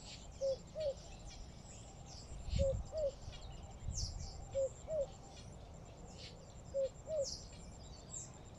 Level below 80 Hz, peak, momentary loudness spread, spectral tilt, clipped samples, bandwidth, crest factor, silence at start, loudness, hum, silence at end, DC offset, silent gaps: -52 dBFS; -24 dBFS; 14 LU; -4.5 dB/octave; under 0.1%; 11.5 kHz; 20 dB; 0 s; -44 LUFS; none; 0 s; under 0.1%; none